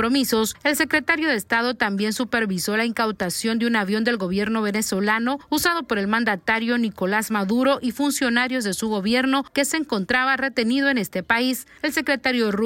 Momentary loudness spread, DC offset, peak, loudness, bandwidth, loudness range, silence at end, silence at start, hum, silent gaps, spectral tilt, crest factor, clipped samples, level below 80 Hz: 4 LU; under 0.1%; -4 dBFS; -21 LUFS; 16.5 kHz; 1 LU; 0 s; 0 s; none; none; -3.5 dB/octave; 18 dB; under 0.1%; -56 dBFS